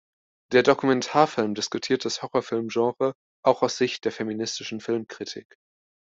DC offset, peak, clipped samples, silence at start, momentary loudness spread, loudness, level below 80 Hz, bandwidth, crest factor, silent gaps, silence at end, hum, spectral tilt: under 0.1%; -4 dBFS; under 0.1%; 0.5 s; 9 LU; -25 LUFS; -68 dBFS; 7.8 kHz; 22 dB; 3.15-3.43 s; 0.8 s; none; -4 dB/octave